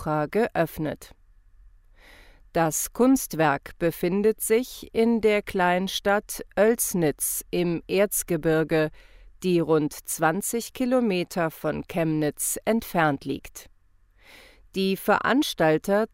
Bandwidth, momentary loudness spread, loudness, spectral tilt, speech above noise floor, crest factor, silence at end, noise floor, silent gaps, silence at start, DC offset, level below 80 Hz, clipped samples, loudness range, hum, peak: 16 kHz; 9 LU; -24 LUFS; -4.5 dB/octave; 35 dB; 18 dB; 0.05 s; -59 dBFS; none; 0 s; under 0.1%; -52 dBFS; under 0.1%; 4 LU; none; -8 dBFS